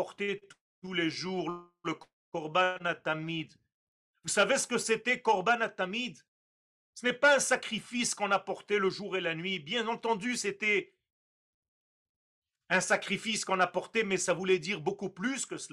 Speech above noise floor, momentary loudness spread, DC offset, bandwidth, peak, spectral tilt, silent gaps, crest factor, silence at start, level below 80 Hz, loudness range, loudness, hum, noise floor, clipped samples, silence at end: over 59 dB; 12 LU; under 0.1%; 13.5 kHz; -14 dBFS; -3 dB/octave; 0.61-0.82 s, 2.13-2.32 s, 3.74-4.14 s, 6.28-6.93 s, 11.12-11.62 s, 11.68-12.42 s; 20 dB; 0 s; -76 dBFS; 4 LU; -31 LUFS; none; under -90 dBFS; under 0.1%; 0.05 s